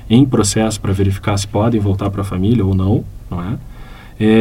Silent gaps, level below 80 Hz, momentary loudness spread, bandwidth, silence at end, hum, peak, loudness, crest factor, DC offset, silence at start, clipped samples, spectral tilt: none; -34 dBFS; 12 LU; 15 kHz; 0 s; none; 0 dBFS; -16 LUFS; 14 dB; under 0.1%; 0 s; under 0.1%; -6 dB/octave